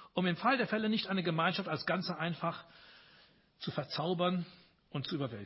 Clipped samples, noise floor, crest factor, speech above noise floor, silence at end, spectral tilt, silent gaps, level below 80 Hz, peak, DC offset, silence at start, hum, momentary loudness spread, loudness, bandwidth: under 0.1%; -64 dBFS; 20 dB; 30 dB; 0 s; -9 dB/octave; none; -74 dBFS; -16 dBFS; under 0.1%; 0 s; none; 10 LU; -35 LUFS; 5.8 kHz